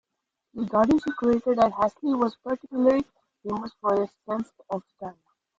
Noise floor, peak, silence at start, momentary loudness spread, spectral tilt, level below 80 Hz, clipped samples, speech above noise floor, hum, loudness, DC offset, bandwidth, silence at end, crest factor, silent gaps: -83 dBFS; -8 dBFS; 0.55 s; 18 LU; -7.5 dB/octave; -58 dBFS; under 0.1%; 58 dB; none; -26 LUFS; under 0.1%; 7.8 kHz; 0.45 s; 18 dB; none